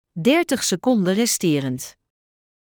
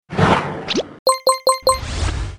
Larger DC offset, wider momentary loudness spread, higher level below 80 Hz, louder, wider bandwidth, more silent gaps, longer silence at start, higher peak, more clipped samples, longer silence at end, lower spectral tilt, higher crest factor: neither; first, 10 LU vs 6 LU; second, -64 dBFS vs -30 dBFS; about the same, -20 LUFS vs -18 LUFS; first, over 20 kHz vs 15 kHz; second, none vs 0.99-1.06 s; about the same, 0.15 s vs 0.1 s; second, -6 dBFS vs 0 dBFS; neither; first, 0.85 s vs 0 s; about the same, -4 dB/octave vs -4 dB/octave; about the same, 16 dB vs 18 dB